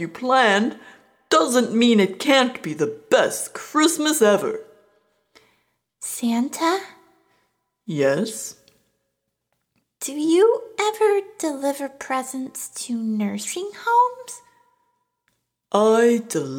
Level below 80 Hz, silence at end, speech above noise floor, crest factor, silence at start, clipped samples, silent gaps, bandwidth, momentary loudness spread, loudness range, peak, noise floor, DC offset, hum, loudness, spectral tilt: -74 dBFS; 0 s; 56 dB; 18 dB; 0 s; under 0.1%; none; 19 kHz; 13 LU; 8 LU; -4 dBFS; -77 dBFS; under 0.1%; none; -21 LUFS; -3.5 dB/octave